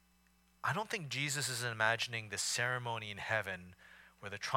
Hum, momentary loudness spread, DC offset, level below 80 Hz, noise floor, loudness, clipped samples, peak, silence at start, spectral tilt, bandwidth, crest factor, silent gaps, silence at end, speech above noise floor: none; 12 LU; under 0.1%; -74 dBFS; -70 dBFS; -36 LUFS; under 0.1%; -16 dBFS; 0.65 s; -2.5 dB/octave; 17.5 kHz; 22 dB; none; 0 s; 32 dB